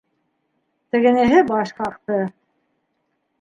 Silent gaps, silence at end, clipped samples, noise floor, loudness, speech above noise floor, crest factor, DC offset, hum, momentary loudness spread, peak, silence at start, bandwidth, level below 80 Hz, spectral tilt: none; 1.1 s; under 0.1%; -71 dBFS; -18 LUFS; 54 dB; 18 dB; under 0.1%; none; 12 LU; -2 dBFS; 0.95 s; 9 kHz; -54 dBFS; -6.5 dB/octave